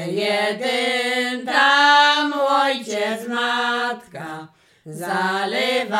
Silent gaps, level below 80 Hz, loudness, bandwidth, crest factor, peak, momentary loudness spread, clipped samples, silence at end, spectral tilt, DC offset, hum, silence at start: none; -74 dBFS; -18 LUFS; 16.5 kHz; 18 dB; -2 dBFS; 18 LU; under 0.1%; 0 s; -3 dB/octave; under 0.1%; none; 0 s